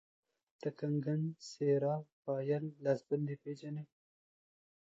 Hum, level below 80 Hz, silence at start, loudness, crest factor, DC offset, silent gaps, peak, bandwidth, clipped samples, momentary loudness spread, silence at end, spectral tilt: none; -84 dBFS; 0.6 s; -38 LUFS; 18 dB; under 0.1%; 2.12-2.23 s; -20 dBFS; 7.8 kHz; under 0.1%; 11 LU; 1.05 s; -8 dB/octave